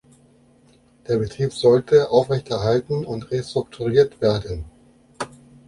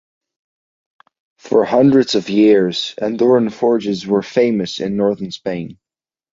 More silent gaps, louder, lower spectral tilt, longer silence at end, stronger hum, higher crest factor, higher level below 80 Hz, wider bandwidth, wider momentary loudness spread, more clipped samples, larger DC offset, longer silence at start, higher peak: neither; second, -20 LUFS vs -16 LUFS; about the same, -6.5 dB/octave vs -6 dB/octave; second, 0.4 s vs 0.6 s; neither; about the same, 18 dB vs 16 dB; first, -46 dBFS vs -58 dBFS; first, 11.5 kHz vs 7.6 kHz; first, 17 LU vs 12 LU; neither; neither; second, 1.1 s vs 1.45 s; second, -4 dBFS vs 0 dBFS